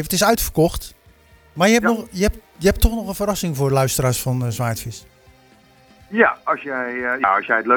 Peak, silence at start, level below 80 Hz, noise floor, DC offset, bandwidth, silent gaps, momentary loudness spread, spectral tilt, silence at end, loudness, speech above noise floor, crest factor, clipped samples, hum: 0 dBFS; 0 s; -32 dBFS; -51 dBFS; under 0.1%; over 20 kHz; none; 10 LU; -4.5 dB/octave; 0 s; -19 LUFS; 32 dB; 20 dB; under 0.1%; none